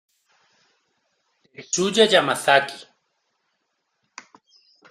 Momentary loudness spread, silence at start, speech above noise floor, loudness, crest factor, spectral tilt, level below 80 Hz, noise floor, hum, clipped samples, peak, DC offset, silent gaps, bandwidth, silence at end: 15 LU; 1.6 s; 55 dB; -19 LUFS; 24 dB; -2.5 dB/octave; -70 dBFS; -74 dBFS; none; under 0.1%; -2 dBFS; under 0.1%; none; 14.5 kHz; 2.1 s